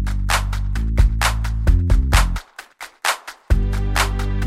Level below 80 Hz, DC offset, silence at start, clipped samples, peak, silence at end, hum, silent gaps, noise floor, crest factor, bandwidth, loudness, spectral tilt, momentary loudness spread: -20 dBFS; under 0.1%; 0 s; under 0.1%; 0 dBFS; 0 s; none; none; -39 dBFS; 18 dB; 15.5 kHz; -20 LUFS; -4 dB/octave; 10 LU